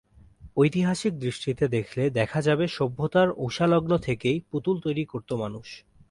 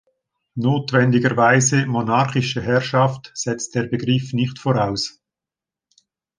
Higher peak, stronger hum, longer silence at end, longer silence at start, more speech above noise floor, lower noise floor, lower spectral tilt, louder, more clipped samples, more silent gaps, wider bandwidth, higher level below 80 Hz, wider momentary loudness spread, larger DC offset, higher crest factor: second, -8 dBFS vs -2 dBFS; neither; second, 0.3 s vs 1.3 s; second, 0.4 s vs 0.55 s; second, 25 dB vs 70 dB; second, -50 dBFS vs -88 dBFS; first, -6.5 dB/octave vs -5 dB/octave; second, -26 LUFS vs -19 LUFS; neither; neither; first, 11.5 kHz vs 10 kHz; about the same, -54 dBFS vs -54 dBFS; about the same, 9 LU vs 10 LU; neither; about the same, 16 dB vs 18 dB